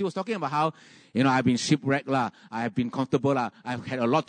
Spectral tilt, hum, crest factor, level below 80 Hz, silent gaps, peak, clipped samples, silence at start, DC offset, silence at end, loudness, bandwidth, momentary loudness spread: -5.5 dB/octave; none; 18 dB; -68 dBFS; none; -10 dBFS; under 0.1%; 0 s; under 0.1%; 0.05 s; -27 LUFS; 9.6 kHz; 8 LU